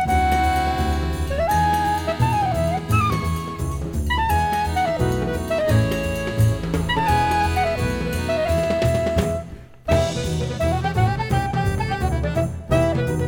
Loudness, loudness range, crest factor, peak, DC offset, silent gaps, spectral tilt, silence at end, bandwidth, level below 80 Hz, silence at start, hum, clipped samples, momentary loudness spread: -21 LUFS; 2 LU; 16 dB; -4 dBFS; under 0.1%; none; -6 dB/octave; 0 s; 18 kHz; -30 dBFS; 0 s; none; under 0.1%; 6 LU